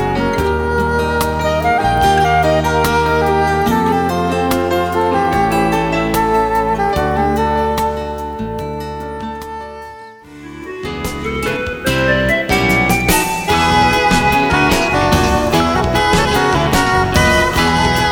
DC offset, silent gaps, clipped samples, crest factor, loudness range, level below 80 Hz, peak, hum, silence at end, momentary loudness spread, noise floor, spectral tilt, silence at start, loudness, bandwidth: under 0.1%; none; under 0.1%; 14 dB; 9 LU; -28 dBFS; 0 dBFS; none; 0 s; 12 LU; -35 dBFS; -4.5 dB/octave; 0 s; -14 LUFS; over 20 kHz